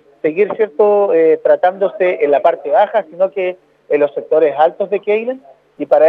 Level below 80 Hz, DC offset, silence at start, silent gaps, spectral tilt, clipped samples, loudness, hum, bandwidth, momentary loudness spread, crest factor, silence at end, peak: -74 dBFS; under 0.1%; 0.25 s; none; -7.5 dB/octave; under 0.1%; -14 LUFS; none; 4.5 kHz; 8 LU; 14 dB; 0 s; 0 dBFS